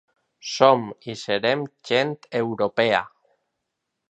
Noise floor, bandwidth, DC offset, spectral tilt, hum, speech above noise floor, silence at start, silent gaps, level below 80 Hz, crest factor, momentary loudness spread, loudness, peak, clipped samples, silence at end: -80 dBFS; 8.4 kHz; under 0.1%; -4.5 dB/octave; none; 58 dB; 0.45 s; none; -68 dBFS; 22 dB; 16 LU; -22 LUFS; -2 dBFS; under 0.1%; 1 s